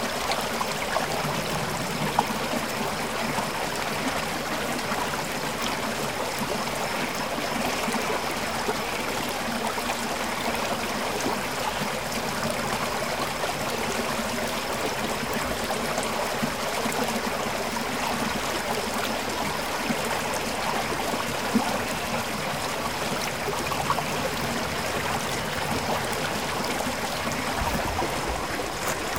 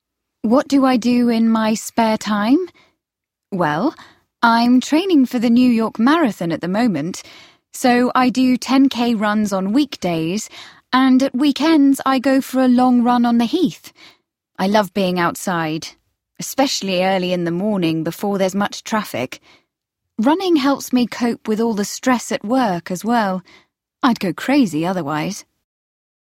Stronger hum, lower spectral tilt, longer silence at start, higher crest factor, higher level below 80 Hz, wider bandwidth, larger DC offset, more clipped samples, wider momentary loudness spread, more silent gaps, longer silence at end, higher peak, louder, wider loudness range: neither; second, -3 dB/octave vs -5 dB/octave; second, 0 s vs 0.45 s; first, 22 dB vs 16 dB; first, -48 dBFS vs -60 dBFS; about the same, 18 kHz vs 16.5 kHz; first, 0.6% vs under 0.1%; neither; second, 2 LU vs 10 LU; neither; second, 0 s vs 0.9 s; second, -6 dBFS vs 0 dBFS; second, -27 LUFS vs -17 LUFS; second, 1 LU vs 4 LU